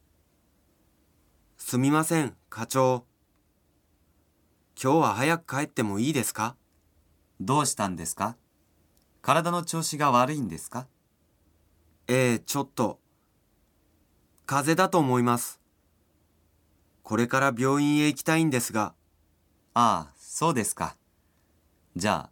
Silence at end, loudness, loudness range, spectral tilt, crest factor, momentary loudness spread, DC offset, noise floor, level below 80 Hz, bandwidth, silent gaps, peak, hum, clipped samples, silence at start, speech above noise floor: 0.05 s; -26 LUFS; 4 LU; -4.5 dB/octave; 22 dB; 11 LU; under 0.1%; -68 dBFS; -66 dBFS; 19 kHz; none; -6 dBFS; none; under 0.1%; 1.6 s; 43 dB